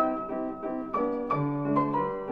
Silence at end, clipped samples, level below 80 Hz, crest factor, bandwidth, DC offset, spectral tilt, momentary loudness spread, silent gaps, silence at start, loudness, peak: 0 s; under 0.1%; -58 dBFS; 16 dB; 5.2 kHz; 0.2%; -10.5 dB/octave; 7 LU; none; 0 s; -29 LUFS; -12 dBFS